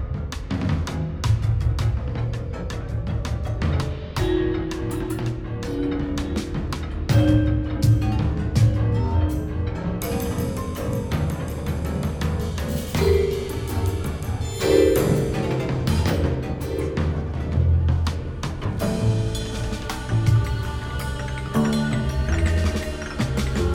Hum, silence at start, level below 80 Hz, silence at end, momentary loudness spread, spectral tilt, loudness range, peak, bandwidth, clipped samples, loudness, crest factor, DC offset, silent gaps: none; 0 s; -30 dBFS; 0 s; 8 LU; -6.5 dB/octave; 4 LU; -6 dBFS; 18.5 kHz; under 0.1%; -24 LUFS; 18 dB; under 0.1%; none